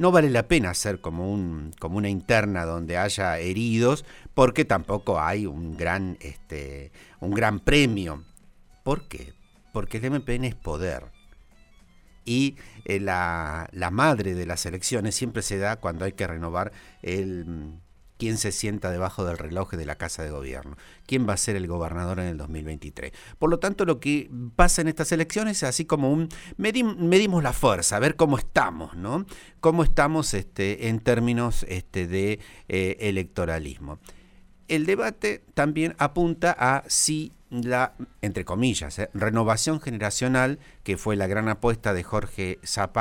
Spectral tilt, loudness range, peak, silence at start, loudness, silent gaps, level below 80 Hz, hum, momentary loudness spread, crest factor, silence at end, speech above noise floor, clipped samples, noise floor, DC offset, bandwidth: -4.5 dB/octave; 7 LU; -4 dBFS; 0 s; -25 LUFS; none; -38 dBFS; none; 13 LU; 22 dB; 0 s; 29 dB; under 0.1%; -54 dBFS; under 0.1%; 17 kHz